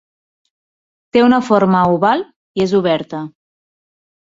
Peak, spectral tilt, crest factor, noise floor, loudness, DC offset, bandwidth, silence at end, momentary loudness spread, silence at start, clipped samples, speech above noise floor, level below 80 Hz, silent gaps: -2 dBFS; -7 dB/octave; 16 dB; under -90 dBFS; -14 LUFS; under 0.1%; 7.8 kHz; 1.05 s; 14 LU; 1.15 s; under 0.1%; over 77 dB; -54 dBFS; 2.36-2.55 s